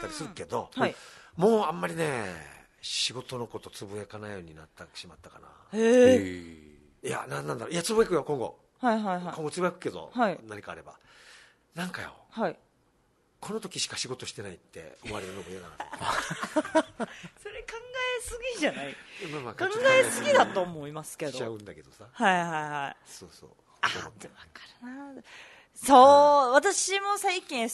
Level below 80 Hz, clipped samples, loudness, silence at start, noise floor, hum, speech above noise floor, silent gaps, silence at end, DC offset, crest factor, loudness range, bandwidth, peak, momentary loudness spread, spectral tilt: -62 dBFS; under 0.1%; -27 LUFS; 0 s; -68 dBFS; none; 40 dB; none; 0 s; under 0.1%; 24 dB; 13 LU; 12 kHz; -4 dBFS; 23 LU; -3.5 dB/octave